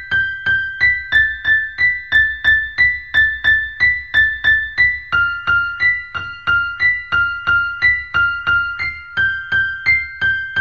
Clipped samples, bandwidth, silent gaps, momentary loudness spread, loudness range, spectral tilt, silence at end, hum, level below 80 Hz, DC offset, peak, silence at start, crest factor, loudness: under 0.1%; 9.2 kHz; none; 5 LU; 2 LU; -3 dB/octave; 0 s; none; -40 dBFS; 0.4%; -4 dBFS; 0 s; 14 dB; -15 LUFS